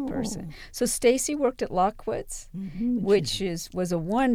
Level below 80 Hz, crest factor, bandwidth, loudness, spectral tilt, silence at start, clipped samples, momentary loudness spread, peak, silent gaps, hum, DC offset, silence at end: -46 dBFS; 18 dB; 17.5 kHz; -26 LUFS; -4.5 dB/octave; 0 s; under 0.1%; 13 LU; -8 dBFS; none; none; under 0.1%; 0 s